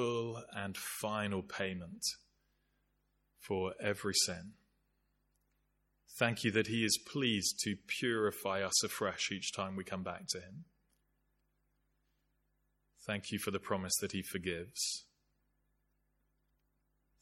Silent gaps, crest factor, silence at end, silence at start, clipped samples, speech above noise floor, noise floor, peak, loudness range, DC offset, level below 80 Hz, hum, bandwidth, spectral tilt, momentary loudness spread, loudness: none; 26 dB; 2.2 s; 0 s; under 0.1%; 42 dB; -79 dBFS; -14 dBFS; 10 LU; under 0.1%; -72 dBFS; 50 Hz at -70 dBFS; 16.5 kHz; -3 dB/octave; 10 LU; -36 LUFS